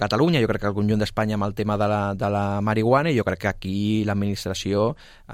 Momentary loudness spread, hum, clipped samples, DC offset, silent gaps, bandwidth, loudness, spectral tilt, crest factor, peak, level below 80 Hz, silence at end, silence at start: 6 LU; none; under 0.1%; under 0.1%; none; 15.5 kHz; -23 LUFS; -6.5 dB/octave; 16 dB; -6 dBFS; -44 dBFS; 0 s; 0 s